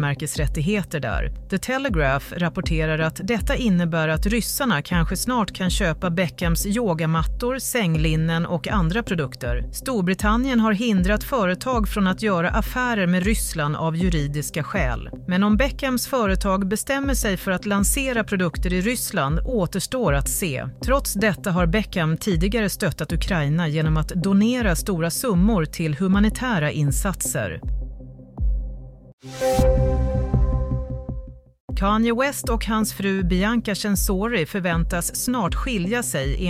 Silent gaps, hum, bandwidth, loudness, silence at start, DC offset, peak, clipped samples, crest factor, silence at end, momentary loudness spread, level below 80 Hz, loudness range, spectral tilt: 29.13-29.18 s, 31.60-31.68 s; none; 16 kHz; -22 LUFS; 0 s; under 0.1%; -6 dBFS; under 0.1%; 14 dB; 0 s; 7 LU; -30 dBFS; 3 LU; -5 dB/octave